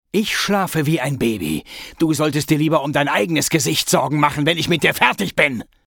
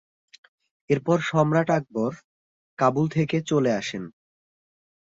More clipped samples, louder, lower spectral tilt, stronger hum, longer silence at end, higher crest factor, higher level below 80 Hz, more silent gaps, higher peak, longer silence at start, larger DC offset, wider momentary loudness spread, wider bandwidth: neither; first, -18 LUFS vs -24 LUFS; second, -4 dB/octave vs -6.5 dB/octave; neither; second, 0.25 s vs 0.95 s; about the same, 18 dB vs 20 dB; first, -48 dBFS vs -64 dBFS; second, none vs 2.24-2.77 s; first, 0 dBFS vs -6 dBFS; second, 0.15 s vs 0.9 s; neither; second, 4 LU vs 9 LU; first, 19 kHz vs 7.8 kHz